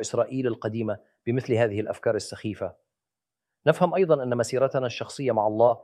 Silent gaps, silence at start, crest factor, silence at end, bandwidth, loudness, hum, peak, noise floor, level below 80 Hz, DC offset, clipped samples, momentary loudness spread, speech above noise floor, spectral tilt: none; 0 s; 20 dB; 0.05 s; 13 kHz; -26 LUFS; none; -4 dBFS; -89 dBFS; -68 dBFS; under 0.1%; under 0.1%; 11 LU; 64 dB; -6 dB/octave